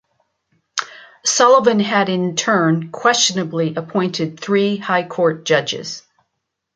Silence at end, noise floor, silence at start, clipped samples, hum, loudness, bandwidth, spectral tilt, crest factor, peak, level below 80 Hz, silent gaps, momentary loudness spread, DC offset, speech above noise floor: 0.75 s; -76 dBFS; 0.75 s; under 0.1%; none; -17 LUFS; 9.6 kHz; -3.5 dB/octave; 16 dB; -2 dBFS; -66 dBFS; none; 13 LU; under 0.1%; 59 dB